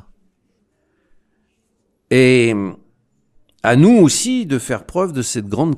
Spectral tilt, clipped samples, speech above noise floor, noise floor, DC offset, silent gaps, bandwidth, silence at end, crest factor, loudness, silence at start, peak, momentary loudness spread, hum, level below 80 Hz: -5 dB/octave; under 0.1%; 52 dB; -66 dBFS; under 0.1%; none; 14.5 kHz; 0 s; 16 dB; -15 LUFS; 2.1 s; 0 dBFS; 11 LU; none; -52 dBFS